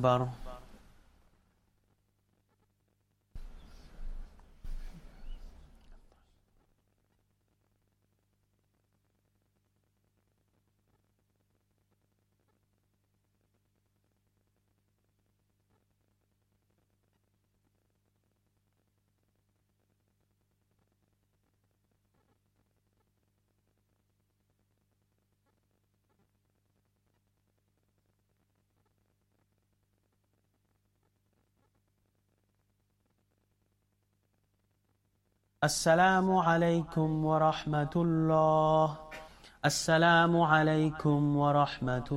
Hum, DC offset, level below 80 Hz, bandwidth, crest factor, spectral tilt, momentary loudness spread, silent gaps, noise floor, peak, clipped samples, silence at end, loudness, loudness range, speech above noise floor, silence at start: 50 Hz at -65 dBFS; under 0.1%; -56 dBFS; 16 kHz; 24 dB; -5.5 dB/octave; 10 LU; none; -76 dBFS; -12 dBFS; under 0.1%; 0 s; -28 LUFS; 6 LU; 49 dB; 0 s